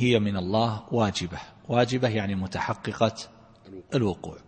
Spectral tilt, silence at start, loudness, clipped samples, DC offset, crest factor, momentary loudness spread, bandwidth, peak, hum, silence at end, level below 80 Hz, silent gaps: -6 dB/octave; 0 s; -27 LUFS; under 0.1%; under 0.1%; 20 dB; 16 LU; 8.8 kHz; -6 dBFS; none; 0.05 s; -54 dBFS; none